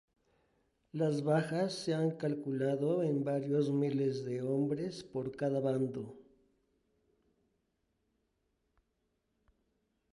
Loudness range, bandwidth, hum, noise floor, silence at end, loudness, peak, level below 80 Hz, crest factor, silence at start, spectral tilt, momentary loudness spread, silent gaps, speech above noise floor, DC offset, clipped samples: 7 LU; 11.5 kHz; none; -81 dBFS; 3.95 s; -34 LUFS; -18 dBFS; -76 dBFS; 18 dB; 0.95 s; -7.5 dB/octave; 7 LU; none; 47 dB; under 0.1%; under 0.1%